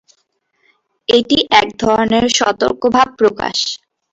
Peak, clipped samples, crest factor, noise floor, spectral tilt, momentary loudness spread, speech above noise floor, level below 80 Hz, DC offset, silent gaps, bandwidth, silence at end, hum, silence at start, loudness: 0 dBFS; under 0.1%; 16 dB; -64 dBFS; -3 dB/octave; 7 LU; 51 dB; -46 dBFS; under 0.1%; none; 8 kHz; 0.35 s; none; 1.1 s; -14 LUFS